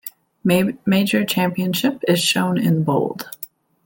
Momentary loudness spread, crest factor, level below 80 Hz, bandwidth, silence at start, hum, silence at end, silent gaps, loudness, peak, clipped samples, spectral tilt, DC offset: 14 LU; 16 dB; -58 dBFS; 17 kHz; 0.05 s; none; 0.4 s; none; -19 LUFS; -4 dBFS; under 0.1%; -5 dB/octave; under 0.1%